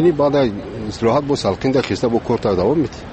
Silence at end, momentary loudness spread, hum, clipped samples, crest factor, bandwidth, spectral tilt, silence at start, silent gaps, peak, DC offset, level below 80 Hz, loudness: 0 s; 5 LU; none; under 0.1%; 12 dB; 8.8 kHz; -6.5 dB/octave; 0 s; none; -4 dBFS; under 0.1%; -40 dBFS; -18 LUFS